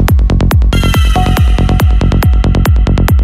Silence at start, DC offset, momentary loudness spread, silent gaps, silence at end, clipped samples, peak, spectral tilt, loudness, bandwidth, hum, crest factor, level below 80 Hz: 0 s; under 0.1%; 0 LU; none; 0 s; under 0.1%; 0 dBFS; -6.5 dB/octave; -10 LUFS; 15.5 kHz; none; 8 dB; -10 dBFS